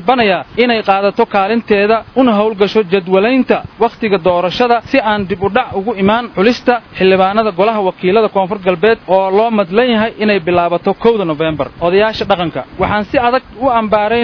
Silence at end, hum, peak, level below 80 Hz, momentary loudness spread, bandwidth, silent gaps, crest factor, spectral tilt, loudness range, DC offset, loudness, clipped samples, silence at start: 0 s; none; 0 dBFS; -42 dBFS; 4 LU; 5.4 kHz; none; 12 dB; -7 dB/octave; 2 LU; under 0.1%; -13 LUFS; 0.2%; 0 s